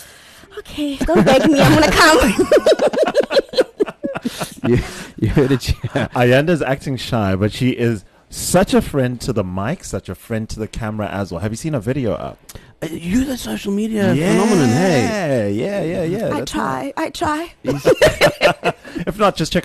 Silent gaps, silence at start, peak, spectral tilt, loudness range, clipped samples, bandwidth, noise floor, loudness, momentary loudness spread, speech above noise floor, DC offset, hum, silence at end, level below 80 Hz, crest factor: none; 0 s; -4 dBFS; -5.5 dB/octave; 9 LU; under 0.1%; 13 kHz; -42 dBFS; -17 LUFS; 13 LU; 26 dB; under 0.1%; none; 0 s; -34 dBFS; 14 dB